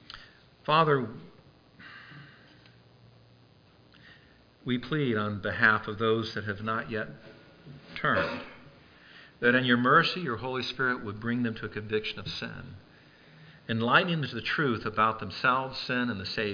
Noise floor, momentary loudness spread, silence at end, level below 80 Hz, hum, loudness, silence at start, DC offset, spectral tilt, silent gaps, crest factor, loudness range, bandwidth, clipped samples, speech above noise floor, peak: -59 dBFS; 20 LU; 0 s; -62 dBFS; none; -28 LUFS; 0.1 s; under 0.1%; -6.5 dB/octave; none; 22 dB; 7 LU; 5.2 kHz; under 0.1%; 30 dB; -8 dBFS